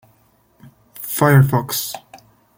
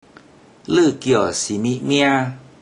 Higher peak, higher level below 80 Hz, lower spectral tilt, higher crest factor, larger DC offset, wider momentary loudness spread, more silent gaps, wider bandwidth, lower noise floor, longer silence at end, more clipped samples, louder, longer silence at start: about the same, -2 dBFS vs -2 dBFS; about the same, -54 dBFS vs -58 dBFS; about the same, -5.5 dB/octave vs -4.5 dB/octave; about the same, 18 dB vs 16 dB; neither; first, 18 LU vs 5 LU; neither; first, 17 kHz vs 10.5 kHz; first, -57 dBFS vs -47 dBFS; first, 0.4 s vs 0.2 s; neither; about the same, -16 LUFS vs -18 LUFS; first, 0.95 s vs 0.7 s